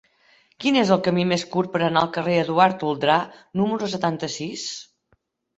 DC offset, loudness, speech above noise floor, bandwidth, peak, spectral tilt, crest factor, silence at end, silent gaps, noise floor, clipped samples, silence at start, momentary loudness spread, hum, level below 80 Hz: under 0.1%; -22 LUFS; 45 dB; 8.2 kHz; -2 dBFS; -5 dB/octave; 20 dB; 0.75 s; none; -67 dBFS; under 0.1%; 0.6 s; 10 LU; none; -62 dBFS